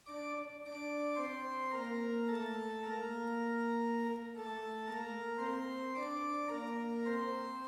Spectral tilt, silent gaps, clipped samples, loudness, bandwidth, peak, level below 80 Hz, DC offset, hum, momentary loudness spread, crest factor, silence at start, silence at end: -5 dB/octave; none; under 0.1%; -39 LUFS; 14.5 kHz; -26 dBFS; -80 dBFS; under 0.1%; none; 6 LU; 14 dB; 0.05 s; 0 s